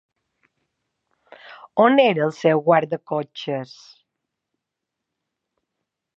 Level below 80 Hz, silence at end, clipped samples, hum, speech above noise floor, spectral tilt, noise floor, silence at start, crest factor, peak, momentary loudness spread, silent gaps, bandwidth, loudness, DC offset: -78 dBFS; 2.5 s; under 0.1%; none; 64 dB; -6.5 dB/octave; -83 dBFS; 1.5 s; 22 dB; -2 dBFS; 13 LU; none; 7.6 kHz; -20 LUFS; under 0.1%